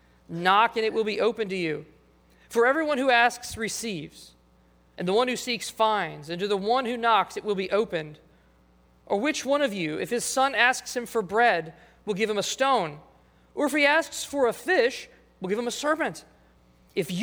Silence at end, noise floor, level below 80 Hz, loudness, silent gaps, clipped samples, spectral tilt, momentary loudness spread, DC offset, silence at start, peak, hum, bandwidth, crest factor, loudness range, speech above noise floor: 0 s; -60 dBFS; -62 dBFS; -25 LUFS; none; under 0.1%; -3.5 dB/octave; 13 LU; under 0.1%; 0.3 s; -6 dBFS; none; over 20 kHz; 22 dB; 3 LU; 34 dB